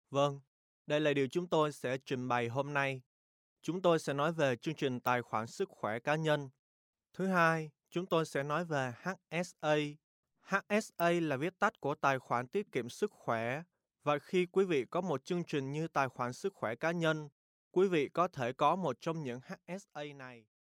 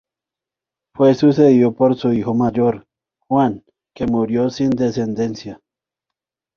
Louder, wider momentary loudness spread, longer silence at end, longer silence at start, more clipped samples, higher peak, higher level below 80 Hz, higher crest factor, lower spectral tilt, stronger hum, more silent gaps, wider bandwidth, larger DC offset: second, -35 LUFS vs -17 LUFS; about the same, 11 LU vs 12 LU; second, 0.3 s vs 1 s; second, 0.1 s vs 1 s; neither; second, -14 dBFS vs -2 dBFS; second, -78 dBFS vs -52 dBFS; about the same, 20 dB vs 16 dB; second, -5.5 dB/octave vs -8 dB/octave; neither; first, 0.47-0.85 s, 3.06-3.56 s, 6.59-6.93 s, 10.04-10.23 s, 17.32-17.71 s vs none; first, 16.5 kHz vs 7 kHz; neither